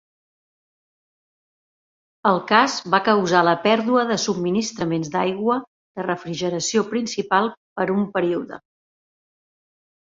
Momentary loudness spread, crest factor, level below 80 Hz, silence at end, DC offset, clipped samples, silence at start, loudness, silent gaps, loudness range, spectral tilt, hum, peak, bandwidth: 10 LU; 20 dB; -64 dBFS; 1.55 s; under 0.1%; under 0.1%; 2.25 s; -21 LUFS; 5.67-5.95 s, 7.57-7.76 s; 5 LU; -4.5 dB/octave; none; -2 dBFS; 7.8 kHz